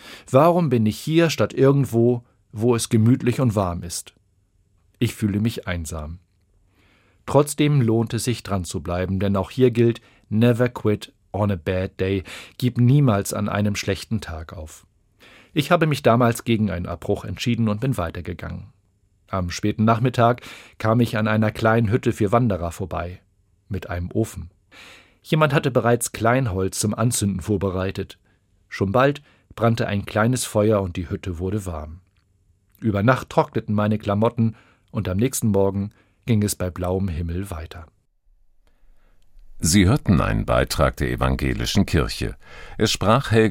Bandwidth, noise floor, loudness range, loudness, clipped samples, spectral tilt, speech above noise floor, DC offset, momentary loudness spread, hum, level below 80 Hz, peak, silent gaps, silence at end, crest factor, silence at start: 16.5 kHz; -63 dBFS; 5 LU; -21 LUFS; under 0.1%; -6 dB/octave; 42 dB; under 0.1%; 14 LU; none; -40 dBFS; 0 dBFS; none; 0 s; 20 dB; 0.05 s